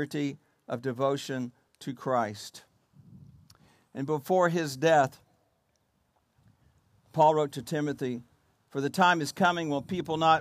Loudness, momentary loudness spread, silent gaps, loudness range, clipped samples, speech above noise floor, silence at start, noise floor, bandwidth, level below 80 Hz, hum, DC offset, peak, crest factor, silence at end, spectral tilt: -28 LUFS; 17 LU; none; 6 LU; under 0.1%; 45 dB; 0 s; -73 dBFS; 15.5 kHz; -72 dBFS; none; under 0.1%; -10 dBFS; 20 dB; 0 s; -5.5 dB/octave